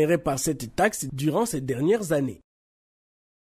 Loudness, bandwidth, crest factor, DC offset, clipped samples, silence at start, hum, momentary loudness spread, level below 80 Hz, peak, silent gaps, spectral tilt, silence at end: -25 LUFS; 16 kHz; 18 dB; under 0.1%; under 0.1%; 0 s; none; 4 LU; -54 dBFS; -8 dBFS; none; -5 dB/octave; 1.05 s